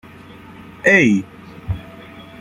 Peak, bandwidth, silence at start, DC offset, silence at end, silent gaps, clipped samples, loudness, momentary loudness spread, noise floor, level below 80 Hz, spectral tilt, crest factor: -2 dBFS; 11.5 kHz; 0.85 s; under 0.1%; 0.2 s; none; under 0.1%; -16 LUFS; 26 LU; -40 dBFS; -44 dBFS; -6 dB/octave; 18 dB